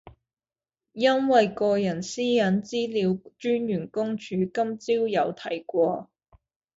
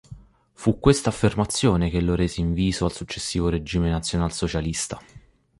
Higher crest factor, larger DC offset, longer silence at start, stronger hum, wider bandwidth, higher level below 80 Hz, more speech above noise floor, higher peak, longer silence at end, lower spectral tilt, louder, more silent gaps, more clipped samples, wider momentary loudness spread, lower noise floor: about the same, 20 dB vs 22 dB; neither; about the same, 0.05 s vs 0.1 s; neither; second, 8 kHz vs 11.5 kHz; second, -64 dBFS vs -36 dBFS; first, over 65 dB vs 23 dB; second, -6 dBFS vs -2 dBFS; first, 0.75 s vs 0.4 s; about the same, -5.5 dB/octave vs -5.5 dB/octave; about the same, -25 LUFS vs -23 LUFS; neither; neither; about the same, 8 LU vs 7 LU; first, under -90 dBFS vs -45 dBFS